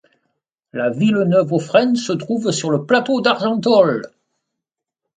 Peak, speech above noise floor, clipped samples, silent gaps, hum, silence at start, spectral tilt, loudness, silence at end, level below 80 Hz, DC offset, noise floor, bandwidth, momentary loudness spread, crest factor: 0 dBFS; 67 dB; under 0.1%; none; none; 0.75 s; -5.5 dB/octave; -17 LUFS; 1.1 s; -64 dBFS; under 0.1%; -83 dBFS; 9.6 kHz; 8 LU; 18 dB